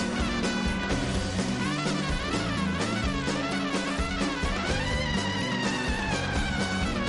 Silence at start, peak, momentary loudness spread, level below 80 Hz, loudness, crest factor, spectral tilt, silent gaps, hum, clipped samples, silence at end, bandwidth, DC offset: 0 s; -16 dBFS; 1 LU; -36 dBFS; -28 LUFS; 12 dB; -4.5 dB/octave; none; none; under 0.1%; 0 s; 11.5 kHz; under 0.1%